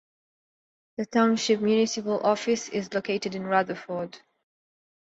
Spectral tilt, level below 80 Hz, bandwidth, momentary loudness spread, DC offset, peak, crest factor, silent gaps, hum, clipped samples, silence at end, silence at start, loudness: -4.5 dB/octave; -70 dBFS; 8 kHz; 12 LU; under 0.1%; -8 dBFS; 20 dB; none; none; under 0.1%; 0.85 s; 1 s; -26 LUFS